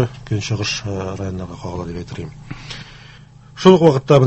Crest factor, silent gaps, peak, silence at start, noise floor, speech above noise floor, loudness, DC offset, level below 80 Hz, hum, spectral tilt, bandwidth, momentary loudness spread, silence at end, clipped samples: 18 dB; none; 0 dBFS; 0 s; -42 dBFS; 25 dB; -18 LUFS; under 0.1%; -42 dBFS; 50 Hz at -40 dBFS; -6.5 dB/octave; 8.4 kHz; 21 LU; 0 s; under 0.1%